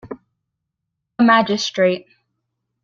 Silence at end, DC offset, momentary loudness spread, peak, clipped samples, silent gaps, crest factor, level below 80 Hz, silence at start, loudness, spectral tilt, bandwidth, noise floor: 0.85 s; under 0.1%; 23 LU; -2 dBFS; under 0.1%; none; 18 dB; -62 dBFS; 0.05 s; -17 LUFS; -4.5 dB/octave; 7.6 kHz; -79 dBFS